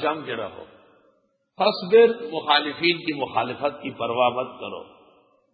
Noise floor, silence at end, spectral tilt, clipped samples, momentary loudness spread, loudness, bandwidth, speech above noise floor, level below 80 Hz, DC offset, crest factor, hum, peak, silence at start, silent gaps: -65 dBFS; 0.7 s; -9 dB/octave; under 0.1%; 16 LU; -22 LUFS; 5 kHz; 42 dB; -68 dBFS; under 0.1%; 20 dB; none; -4 dBFS; 0 s; none